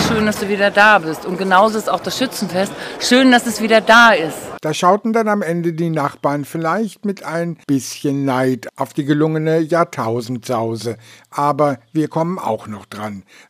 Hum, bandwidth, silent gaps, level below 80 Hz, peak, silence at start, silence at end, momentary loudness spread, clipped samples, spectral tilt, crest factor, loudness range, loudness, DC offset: none; 16 kHz; none; -54 dBFS; 0 dBFS; 0 s; 0.3 s; 13 LU; under 0.1%; -4.5 dB/octave; 16 dB; 7 LU; -16 LUFS; under 0.1%